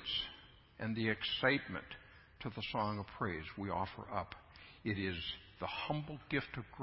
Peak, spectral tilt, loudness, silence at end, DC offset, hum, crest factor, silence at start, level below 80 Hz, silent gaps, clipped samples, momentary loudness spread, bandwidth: -18 dBFS; -3 dB/octave; -40 LUFS; 0 s; under 0.1%; none; 24 dB; 0 s; -60 dBFS; none; under 0.1%; 15 LU; 5.6 kHz